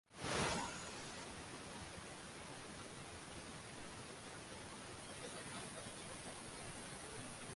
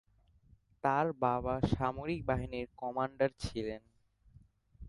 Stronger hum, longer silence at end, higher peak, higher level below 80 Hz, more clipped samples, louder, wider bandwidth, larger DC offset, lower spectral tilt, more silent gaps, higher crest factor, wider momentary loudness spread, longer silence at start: neither; about the same, 0 s vs 0 s; second, -26 dBFS vs -16 dBFS; second, -66 dBFS vs -52 dBFS; neither; second, -48 LUFS vs -35 LUFS; about the same, 11.5 kHz vs 11.5 kHz; neither; second, -3 dB/octave vs -7 dB/octave; neither; about the same, 24 dB vs 20 dB; about the same, 10 LU vs 9 LU; second, 0.1 s vs 0.85 s